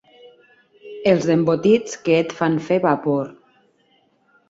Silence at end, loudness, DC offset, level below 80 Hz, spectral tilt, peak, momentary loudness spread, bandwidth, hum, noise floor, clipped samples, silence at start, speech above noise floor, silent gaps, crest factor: 1.2 s; -19 LUFS; under 0.1%; -62 dBFS; -6.5 dB/octave; -2 dBFS; 7 LU; 7.8 kHz; none; -61 dBFS; under 0.1%; 0.85 s; 43 dB; none; 18 dB